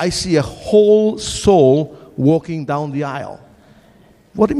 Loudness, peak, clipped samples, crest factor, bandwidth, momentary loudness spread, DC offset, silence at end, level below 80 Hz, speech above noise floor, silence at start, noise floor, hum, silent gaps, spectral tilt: -15 LUFS; -2 dBFS; under 0.1%; 14 dB; 12 kHz; 15 LU; under 0.1%; 0 s; -42 dBFS; 34 dB; 0 s; -49 dBFS; none; none; -6 dB/octave